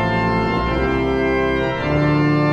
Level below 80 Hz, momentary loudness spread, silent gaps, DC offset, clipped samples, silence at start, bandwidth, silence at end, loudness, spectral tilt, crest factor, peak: -32 dBFS; 3 LU; none; under 0.1%; under 0.1%; 0 s; 8.4 kHz; 0 s; -18 LUFS; -8 dB/octave; 12 dB; -6 dBFS